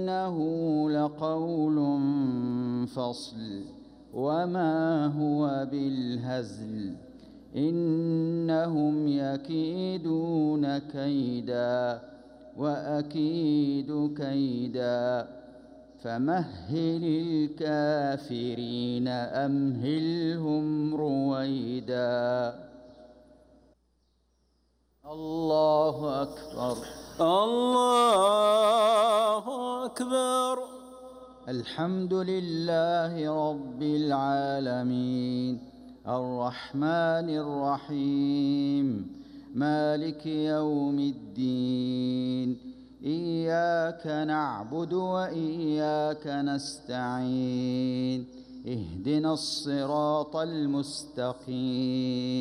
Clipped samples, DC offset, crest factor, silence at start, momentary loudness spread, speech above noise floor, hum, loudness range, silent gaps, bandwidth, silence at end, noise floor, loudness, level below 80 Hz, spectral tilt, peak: under 0.1%; under 0.1%; 16 dB; 0 s; 10 LU; 42 dB; none; 6 LU; none; 15 kHz; 0 s; -70 dBFS; -29 LUFS; -64 dBFS; -6.5 dB/octave; -14 dBFS